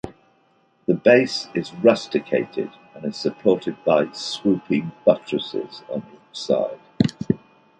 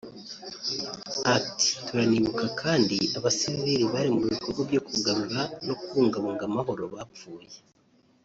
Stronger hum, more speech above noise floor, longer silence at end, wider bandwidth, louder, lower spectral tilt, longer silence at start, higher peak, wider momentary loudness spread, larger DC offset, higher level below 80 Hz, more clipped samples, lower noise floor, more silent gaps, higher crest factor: neither; first, 40 dB vs 36 dB; second, 0.45 s vs 0.65 s; first, 9.8 kHz vs 8 kHz; first, -22 LUFS vs -27 LUFS; first, -6 dB/octave vs -4 dB/octave; about the same, 0.05 s vs 0.05 s; first, -2 dBFS vs -8 dBFS; about the same, 14 LU vs 15 LU; neither; about the same, -58 dBFS vs -62 dBFS; neither; about the same, -61 dBFS vs -63 dBFS; neither; about the same, 20 dB vs 18 dB